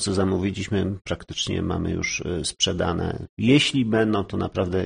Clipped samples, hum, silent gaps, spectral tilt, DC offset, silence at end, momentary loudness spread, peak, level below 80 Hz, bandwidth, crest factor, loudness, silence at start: under 0.1%; none; 3.29-3.37 s; -4.5 dB/octave; under 0.1%; 0 s; 9 LU; -6 dBFS; -44 dBFS; 10 kHz; 18 dB; -24 LUFS; 0 s